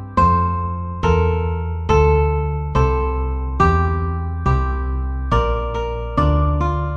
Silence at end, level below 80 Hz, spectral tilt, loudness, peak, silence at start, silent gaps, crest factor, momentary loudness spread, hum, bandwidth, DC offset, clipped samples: 0 s; -22 dBFS; -8 dB/octave; -19 LUFS; -2 dBFS; 0 s; none; 16 dB; 8 LU; none; 7 kHz; under 0.1%; under 0.1%